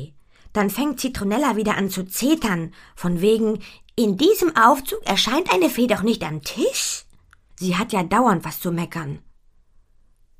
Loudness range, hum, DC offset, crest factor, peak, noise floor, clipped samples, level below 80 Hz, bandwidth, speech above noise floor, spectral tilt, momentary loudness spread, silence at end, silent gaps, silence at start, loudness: 4 LU; none; under 0.1%; 22 dB; 0 dBFS; -55 dBFS; under 0.1%; -48 dBFS; 15.5 kHz; 35 dB; -4.5 dB/octave; 12 LU; 1.2 s; none; 0 s; -21 LUFS